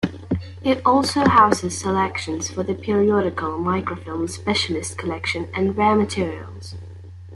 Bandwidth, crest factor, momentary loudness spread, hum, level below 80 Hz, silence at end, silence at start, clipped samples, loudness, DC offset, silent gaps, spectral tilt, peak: 12 kHz; 18 dB; 12 LU; none; -52 dBFS; 0 s; 0 s; under 0.1%; -21 LUFS; under 0.1%; none; -5 dB/octave; -2 dBFS